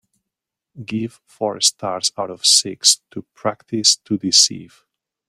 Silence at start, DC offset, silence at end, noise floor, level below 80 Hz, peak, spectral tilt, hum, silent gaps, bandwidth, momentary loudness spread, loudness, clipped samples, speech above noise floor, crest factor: 0.75 s; under 0.1%; 0.65 s; -84 dBFS; -66 dBFS; 0 dBFS; -1.5 dB/octave; none; none; 16 kHz; 15 LU; -16 LUFS; under 0.1%; 64 dB; 20 dB